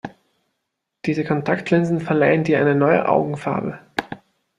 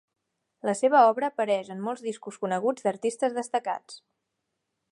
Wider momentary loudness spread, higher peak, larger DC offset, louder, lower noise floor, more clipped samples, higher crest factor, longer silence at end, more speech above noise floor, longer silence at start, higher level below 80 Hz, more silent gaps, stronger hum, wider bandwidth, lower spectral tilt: about the same, 12 LU vs 14 LU; first, -2 dBFS vs -6 dBFS; neither; first, -20 LUFS vs -27 LUFS; about the same, -78 dBFS vs -81 dBFS; neither; about the same, 18 dB vs 20 dB; second, 0.4 s vs 0.95 s; first, 59 dB vs 55 dB; second, 0.05 s vs 0.65 s; first, -58 dBFS vs -84 dBFS; neither; neither; about the same, 10.5 kHz vs 11.5 kHz; first, -8 dB/octave vs -4.5 dB/octave